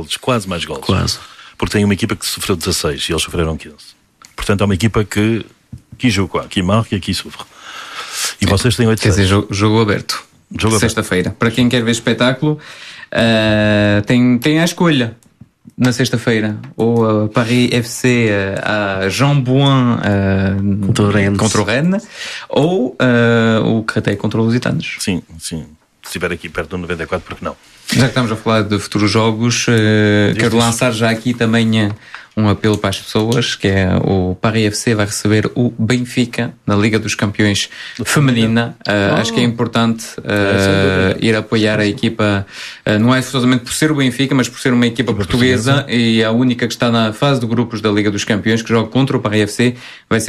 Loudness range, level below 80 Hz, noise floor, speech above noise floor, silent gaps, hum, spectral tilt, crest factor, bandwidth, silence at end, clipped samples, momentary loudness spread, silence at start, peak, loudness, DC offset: 4 LU; -40 dBFS; -43 dBFS; 28 dB; none; none; -5 dB/octave; 14 dB; 14 kHz; 0 s; under 0.1%; 10 LU; 0 s; 0 dBFS; -15 LUFS; under 0.1%